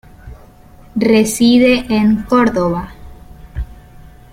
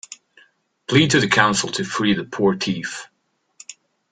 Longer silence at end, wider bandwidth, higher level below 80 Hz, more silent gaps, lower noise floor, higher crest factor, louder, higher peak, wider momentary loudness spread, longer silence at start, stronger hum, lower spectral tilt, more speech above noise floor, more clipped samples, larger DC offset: first, 0.6 s vs 0.4 s; first, 16 kHz vs 9.6 kHz; first, -34 dBFS vs -54 dBFS; neither; second, -41 dBFS vs -57 dBFS; second, 14 dB vs 20 dB; first, -13 LUFS vs -19 LUFS; about the same, -2 dBFS vs 0 dBFS; second, 19 LU vs 24 LU; first, 0.25 s vs 0.1 s; neither; about the same, -5 dB/octave vs -4 dB/octave; second, 29 dB vs 38 dB; neither; neither